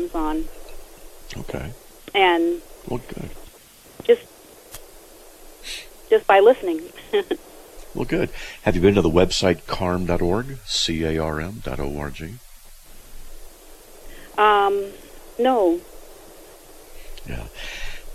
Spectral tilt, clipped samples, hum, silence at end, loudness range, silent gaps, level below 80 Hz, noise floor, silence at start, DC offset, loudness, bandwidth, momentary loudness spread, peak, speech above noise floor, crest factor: -5 dB/octave; under 0.1%; none; 0 s; 7 LU; none; -38 dBFS; -48 dBFS; 0 s; under 0.1%; -21 LUFS; 15 kHz; 22 LU; -4 dBFS; 27 dB; 20 dB